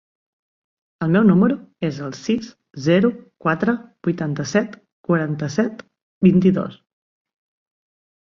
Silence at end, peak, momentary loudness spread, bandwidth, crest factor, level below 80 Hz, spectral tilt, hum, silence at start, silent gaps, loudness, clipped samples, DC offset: 1.55 s; -2 dBFS; 12 LU; 7.2 kHz; 18 dB; -56 dBFS; -7.5 dB/octave; none; 1 s; 4.92-5.04 s, 6.02-6.21 s; -20 LUFS; under 0.1%; under 0.1%